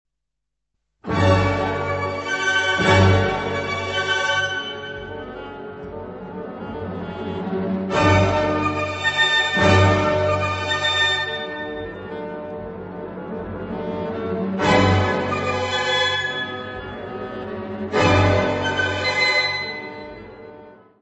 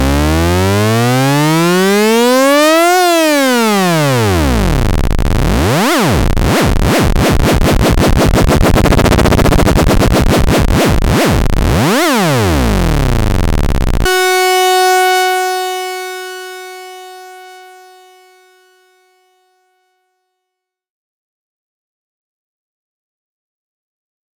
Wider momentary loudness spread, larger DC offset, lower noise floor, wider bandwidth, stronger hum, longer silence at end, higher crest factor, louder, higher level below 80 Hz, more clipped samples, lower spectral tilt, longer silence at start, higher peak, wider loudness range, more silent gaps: first, 17 LU vs 7 LU; neither; first, -81 dBFS vs -77 dBFS; second, 8.4 kHz vs 19.5 kHz; neither; second, 0.25 s vs 6.75 s; first, 18 dB vs 12 dB; second, -20 LUFS vs -11 LUFS; second, -46 dBFS vs -18 dBFS; neither; about the same, -5 dB/octave vs -5 dB/octave; first, 1.05 s vs 0 s; about the same, -2 dBFS vs 0 dBFS; first, 8 LU vs 5 LU; neither